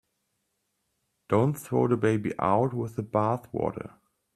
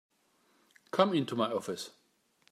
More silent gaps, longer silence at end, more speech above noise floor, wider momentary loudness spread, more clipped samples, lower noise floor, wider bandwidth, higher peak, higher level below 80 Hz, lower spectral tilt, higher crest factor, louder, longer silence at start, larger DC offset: neither; second, 0.45 s vs 0.65 s; first, 51 dB vs 40 dB; second, 8 LU vs 13 LU; neither; first, -78 dBFS vs -71 dBFS; about the same, 13.5 kHz vs 14.5 kHz; about the same, -10 dBFS vs -10 dBFS; first, -62 dBFS vs -84 dBFS; first, -8 dB/octave vs -5.5 dB/octave; second, 18 dB vs 24 dB; first, -27 LUFS vs -32 LUFS; first, 1.3 s vs 0.95 s; neither